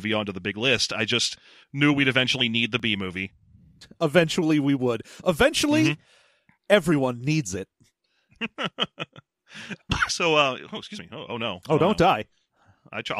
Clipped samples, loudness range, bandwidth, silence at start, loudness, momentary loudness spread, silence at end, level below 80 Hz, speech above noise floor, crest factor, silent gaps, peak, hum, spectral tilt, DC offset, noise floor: under 0.1%; 4 LU; 15 kHz; 0 s; -23 LUFS; 17 LU; 0 s; -52 dBFS; 41 dB; 20 dB; none; -4 dBFS; none; -4.5 dB/octave; under 0.1%; -66 dBFS